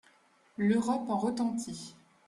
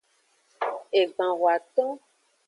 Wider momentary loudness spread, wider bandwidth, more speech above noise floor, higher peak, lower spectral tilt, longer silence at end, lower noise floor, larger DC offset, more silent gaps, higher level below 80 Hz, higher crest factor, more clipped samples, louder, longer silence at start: first, 18 LU vs 9 LU; about the same, 12 kHz vs 11 kHz; second, 35 dB vs 43 dB; second, -16 dBFS vs -10 dBFS; first, -6 dB/octave vs -4 dB/octave; second, 0.35 s vs 0.5 s; about the same, -65 dBFS vs -67 dBFS; neither; neither; first, -70 dBFS vs -86 dBFS; about the same, 16 dB vs 16 dB; neither; second, -31 LUFS vs -26 LUFS; about the same, 0.6 s vs 0.6 s